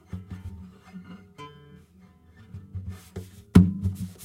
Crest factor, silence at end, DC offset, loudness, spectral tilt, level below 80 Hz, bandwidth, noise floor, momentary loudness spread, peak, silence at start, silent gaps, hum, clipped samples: 26 dB; 0 s; under 0.1%; -22 LUFS; -8 dB/octave; -44 dBFS; 14 kHz; -55 dBFS; 26 LU; -2 dBFS; 0.15 s; none; none; under 0.1%